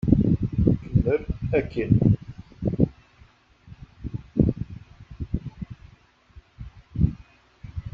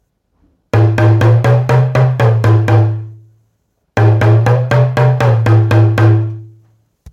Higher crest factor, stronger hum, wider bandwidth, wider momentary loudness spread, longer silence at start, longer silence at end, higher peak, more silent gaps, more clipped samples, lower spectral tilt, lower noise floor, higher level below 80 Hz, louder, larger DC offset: first, 22 dB vs 10 dB; neither; second, 5.6 kHz vs 7.2 kHz; first, 23 LU vs 7 LU; second, 0.05 s vs 0.75 s; second, 0 s vs 0.65 s; second, -4 dBFS vs 0 dBFS; neither; neither; first, -10.5 dB/octave vs -8.5 dB/octave; second, -55 dBFS vs -63 dBFS; about the same, -36 dBFS vs -40 dBFS; second, -25 LUFS vs -11 LUFS; neither